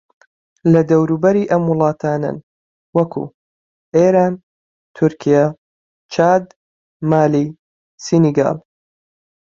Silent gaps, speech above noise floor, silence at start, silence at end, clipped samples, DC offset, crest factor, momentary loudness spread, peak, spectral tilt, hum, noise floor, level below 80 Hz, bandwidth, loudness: 2.43-2.93 s, 3.34-3.92 s, 4.43-4.94 s, 5.58-6.09 s, 6.56-7.00 s, 7.59-7.98 s; over 76 dB; 0.65 s; 0.85 s; under 0.1%; under 0.1%; 16 dB; 12 LU; 0 dBFS; -7.5 dB/octave; none; under -90 dBFS; -58 dBFS; 7.6 kHz; -16 LUFS